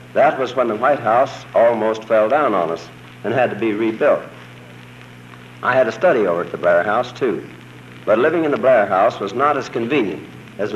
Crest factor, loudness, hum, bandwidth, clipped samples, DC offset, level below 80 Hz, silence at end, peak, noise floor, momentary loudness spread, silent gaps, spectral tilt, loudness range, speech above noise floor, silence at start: 14 dB; -17 LUFS; none; 12.5 kHz; under 0.1%; under 0.1%; -62 dBFS; 0 s; -4 dBFS; -39 dBFS; 13 LU; none; -6.5 dB/octave; 3 LU; 22 dB; 0 s